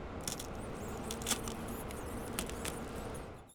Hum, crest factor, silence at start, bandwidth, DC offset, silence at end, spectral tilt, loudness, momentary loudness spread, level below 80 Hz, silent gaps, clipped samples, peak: none; 22 dB; 0 s; over 20 kHz; under 0.1%; 0 s; -3.5 dB/octave; -41 LUFS; 8 LU; -50 dBFS; none; under 0.1%; -20 dBFS